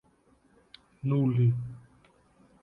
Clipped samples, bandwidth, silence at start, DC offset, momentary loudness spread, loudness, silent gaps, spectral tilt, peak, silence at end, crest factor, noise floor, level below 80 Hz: under 0.1%; 4.7 kHz; 1.05 s; under 0.1%; 18 LU; -28 LUFS; none; -10.5 dB/octave; -16 dBFS; 0.85 s; 16 dB; -65 dBFS; -64 dBFS